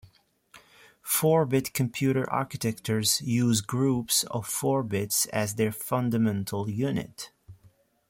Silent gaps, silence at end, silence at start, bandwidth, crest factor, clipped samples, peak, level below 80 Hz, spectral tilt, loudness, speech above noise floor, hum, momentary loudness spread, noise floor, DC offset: none; 0.55 s; 0.55 s; 16.5 kHz; 18 dB; under 0.1%; -10 dBFS; -62 dBFS; -4.5 dB/octave; -27 LUFS; 34 dB; none; 7 LU; -61 dBFS; under 0.1%